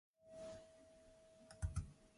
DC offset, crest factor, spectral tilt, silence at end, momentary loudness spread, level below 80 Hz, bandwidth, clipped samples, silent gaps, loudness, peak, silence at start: under 0.1%; 20 dB; -6 dB/octave; 0 s; 19 LU; -56 dBFS; 11.5 kHz; under 0.1%; none; -52 LUFS; -32 dBFS; 0.2 s